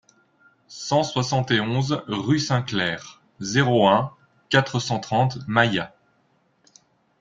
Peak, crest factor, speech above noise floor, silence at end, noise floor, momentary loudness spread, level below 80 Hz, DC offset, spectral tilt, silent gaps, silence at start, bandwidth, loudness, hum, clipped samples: -2 dBFS; 20 dB; 43 dB; 1.3 s; -65 dBFS; 14 LU; -58 dBFS; under 0.1%; -5 dB/octave; none; 0.7 s; 7.8 kHz; -22 LUFS; none; under 0.1%